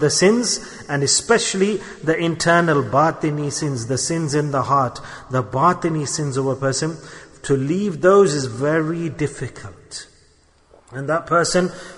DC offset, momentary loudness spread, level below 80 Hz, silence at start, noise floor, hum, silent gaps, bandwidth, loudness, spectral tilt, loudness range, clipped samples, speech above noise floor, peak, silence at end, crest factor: under 0.1%; 16 LU; -50 dBFS; 0 s; -55 dBFS; none; none; 11 kHz; -19 LUFS; -4.5 dB/octave; 3 LU; under 0.1%; 36 dB; -2 dBFS; 0 s; 18 dB